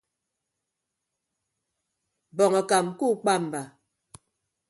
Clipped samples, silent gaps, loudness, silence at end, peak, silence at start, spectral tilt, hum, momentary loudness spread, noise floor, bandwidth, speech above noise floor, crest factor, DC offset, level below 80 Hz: under 0.1%; none; -24 LUFS; 1 s; -8 dBFS; 2.35 s; -4.5 dB/octave; none; 15 LU; -84 dBFS; 11.5 kHz; 60 dB; 22 dB; under 0.1%; -74 dBFS